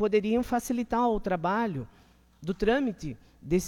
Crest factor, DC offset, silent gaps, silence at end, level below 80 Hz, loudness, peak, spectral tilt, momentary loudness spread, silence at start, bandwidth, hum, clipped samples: 18 dB; under 0.1%; none; 0 s; -46 dBFS; -28 LUFS; -12 dBFS; -6 dB/octave; 14 LU; 0 s; 17 kHz; none; under 0.1%